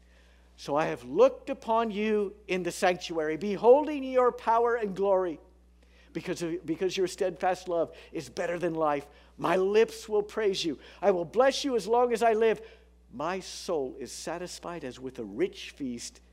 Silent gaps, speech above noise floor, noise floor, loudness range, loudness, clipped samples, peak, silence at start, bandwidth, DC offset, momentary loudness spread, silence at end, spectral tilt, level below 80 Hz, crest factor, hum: none; 30 dB; -58 dBFS; 6 LU; -29 LUFS; under 0.1%; -10 dBFS; 0.6 s; 15 kHz; under 0.1%; 14 LU; 0.25 s; -4.5 dB/octave; -60 dBFS; 20 dB; none